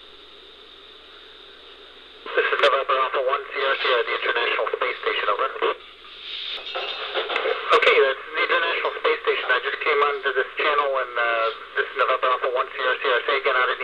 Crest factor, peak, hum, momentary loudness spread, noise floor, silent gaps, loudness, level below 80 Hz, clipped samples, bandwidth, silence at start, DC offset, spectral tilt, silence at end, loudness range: 20 dB; -4 dBFS; none; 9 LU; -46 dBFS; none; -22 LUFS; -64 dBFS; under 0.1%; 9.8 kHz; 0 s; under 0.1%; -2 dB/octave; 0 s; 4 LU